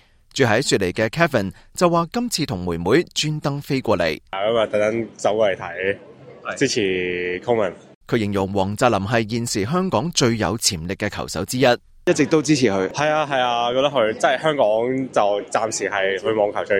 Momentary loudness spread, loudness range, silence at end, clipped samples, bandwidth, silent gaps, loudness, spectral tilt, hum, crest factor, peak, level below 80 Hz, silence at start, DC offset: 6 LU; 3 LU; 0 s; under 0.1%; 16.5 kHz; 7.95-8.01 s; -20 LUFS; -4.5 dB/octave; none; 18 dB; -2 dBFS; -52 dBFS; 0.35 s; under 0.1%